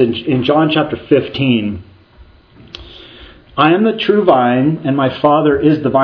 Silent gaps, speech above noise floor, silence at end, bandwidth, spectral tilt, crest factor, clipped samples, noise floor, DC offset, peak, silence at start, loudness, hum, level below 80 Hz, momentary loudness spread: none; 31 dB; 0 s; 5.4 kHz; -9 dB/octave; 14 dB; under 0.1%; -43 dBFS; under 0.1%; 0 dBFS; 0 s; -13 LUFS; none; -46 dBFS; 16 LU